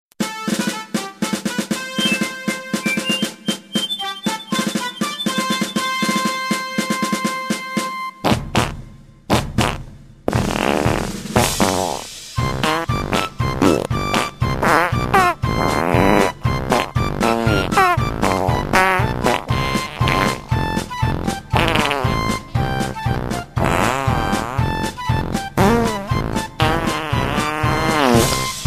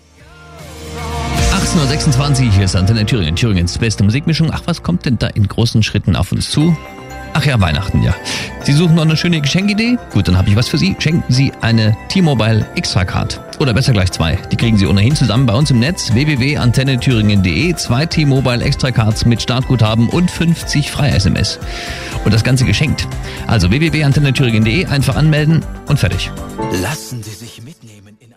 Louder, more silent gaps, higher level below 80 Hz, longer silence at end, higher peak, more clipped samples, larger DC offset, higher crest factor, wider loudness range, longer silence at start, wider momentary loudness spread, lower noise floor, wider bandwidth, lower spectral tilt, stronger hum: second, -19 LUFS vs -14 LUFS; neither; about the same, -32 dBFS vs -28 dBFS; second, 0 s vs 0.45 s; about the same, 0 dBFS vs -2 dBFS; neither; neither; first, 18 dB vs 12 dB; about the same, 4 LU vs 2 LU; second, 0.2 s vs 0.4 s; about the same, 7 LU vs 8 LU; about the same, -39 dBFS vs -41 dBFS; about the same, 15 kHz vs 15.5 kHz; about the same, -4.5 dB/octave vs -5.5 dB/octave; neither